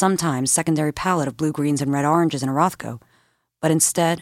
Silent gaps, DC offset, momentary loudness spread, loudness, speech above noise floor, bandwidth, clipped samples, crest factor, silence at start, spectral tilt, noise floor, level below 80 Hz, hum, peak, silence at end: none; under 0.1%; 7 LU; -20 LUFS; 43 dB; 16.5 kHz; under 0.1%; 16 dB; 0 s; -4.5 dB/octave; -63 dBFS; -54 dBFS; none; -4 dBFS; 0 s